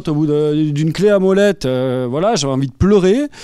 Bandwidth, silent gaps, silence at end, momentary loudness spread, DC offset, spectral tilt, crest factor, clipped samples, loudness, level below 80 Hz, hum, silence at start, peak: 13 kHz; none; 0 s; 6 LU; under 0.1%; -6.5 dB/octave; 12 dB; under 0.1%; -15 LUFS; -38 dBFS; none; 0 s; -2 dBFS